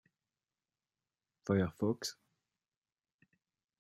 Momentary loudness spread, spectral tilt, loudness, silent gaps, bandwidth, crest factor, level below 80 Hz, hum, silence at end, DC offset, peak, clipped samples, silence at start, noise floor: 10 LU; -6 dB/octave; -36 LUFS; none; 13.5 kHz; 22 dB; -76 dBFS; none; 1.65 s; under 0.1%; -20 dBFS; under 0.1%; 1.5 s; under -90 dBFS